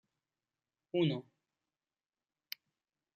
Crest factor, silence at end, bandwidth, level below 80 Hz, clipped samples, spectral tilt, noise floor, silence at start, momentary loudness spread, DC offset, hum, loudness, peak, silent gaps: 22 dB; 1.95 s; 9.4 kHz; -84 dBFS; under 0.1%; -7 dB/octave; under -90 dBFS; 0.95 s; 15 LU; under 0.1%; none; -36 LUFS; -20 dBFS; none